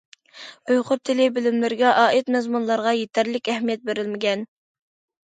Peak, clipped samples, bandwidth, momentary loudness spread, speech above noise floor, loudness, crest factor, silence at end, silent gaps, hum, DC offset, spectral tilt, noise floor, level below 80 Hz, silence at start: -4 dBFS; under 0.1%; 9.2 kHz; 11 LU; 23 dB; -21 LUFS; 18 dB; 0.8 s; none; none; under 0.1%; -4.5 dB/octave; -44 dBFS; -74 dBFS; 0.35 s